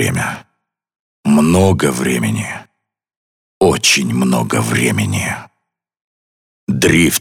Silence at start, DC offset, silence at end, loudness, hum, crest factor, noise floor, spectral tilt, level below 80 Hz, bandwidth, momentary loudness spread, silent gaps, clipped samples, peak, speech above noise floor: 0 s; under 0.1%; 0 s; -14 LUFS; none; 14 dB; -73 dBFS; -4.5 dB/octave; -42 dBFS; 19.5 kHz; 13 LU; 1.00-1.24 s, 3.17-3.61 s, 6.01-6.67 s; under 0.1%; -2 dBFS; 59 dB